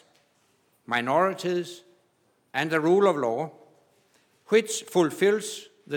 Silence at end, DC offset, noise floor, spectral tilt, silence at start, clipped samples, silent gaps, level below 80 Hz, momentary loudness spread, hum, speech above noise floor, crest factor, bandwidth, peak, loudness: 0 s; under 0.1%; -68 dBFS; -4.5 dB/octave; 0.9 s; under 0.1%; none; -84 dBFS; 15 LU; none; 44 dB; 18 dB; 18.5 kHz; -8 dBFS; -25 LUFS